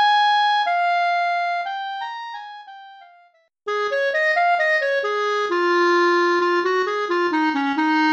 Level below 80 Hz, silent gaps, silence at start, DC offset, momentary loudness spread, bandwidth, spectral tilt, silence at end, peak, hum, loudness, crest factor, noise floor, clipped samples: -76 dBFS; none; 0 s; under 0.1%; 12 LU; 8.2 kHz; -2 dB/octave; 0 s; -8 dBFS; none; -19 LUFS; 12 dB; -56 dBFS; under 0.1%